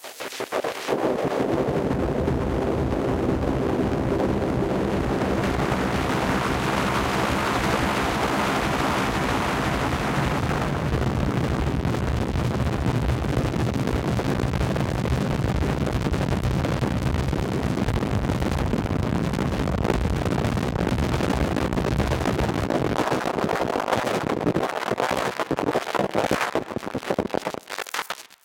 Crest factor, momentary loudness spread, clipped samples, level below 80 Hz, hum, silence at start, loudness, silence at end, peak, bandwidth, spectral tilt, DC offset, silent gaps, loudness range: 18 dB; 3 LU; under 0.1%; -34 dBFS; none; 0 s; -24 LUFS; 0.2 s; -6 dBFS; 17 kHz; -6 dB/octave; under 0.1%; none; 2 LU